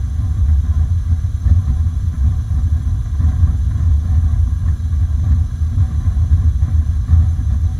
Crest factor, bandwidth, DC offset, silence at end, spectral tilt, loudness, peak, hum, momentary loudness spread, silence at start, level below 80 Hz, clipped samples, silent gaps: 12 dB; 6.6 kHz; under 0.1%; 0 s; -8.5 dB/octave; -17 LUFS; -2 dBFS; none; 3 LU; 0 s; -16 dBFS; under 0.1%; none